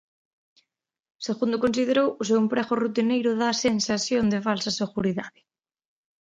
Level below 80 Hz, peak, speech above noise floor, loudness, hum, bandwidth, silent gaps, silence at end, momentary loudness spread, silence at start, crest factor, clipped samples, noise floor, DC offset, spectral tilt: -60 dBFS; -8 dBFS; 56 dB; -24 LUFS; none; 9.2 kHz; none; 0.9 s; 5 LU; 1.2 s; 18 dB; under 0.1%; -80 dBFS; under 0.1%; -4.5 dB/octave